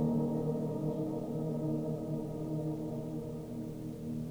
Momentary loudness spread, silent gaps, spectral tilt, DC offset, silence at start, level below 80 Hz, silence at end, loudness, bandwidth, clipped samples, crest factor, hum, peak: 8 LU; none; -9.5 dB/octave; under 0.1%; 0 s; -58 dBFS; 0 s; -37 LUFS; over 20 kHz; under 0.1%; 16 dB; none; -20 dBFS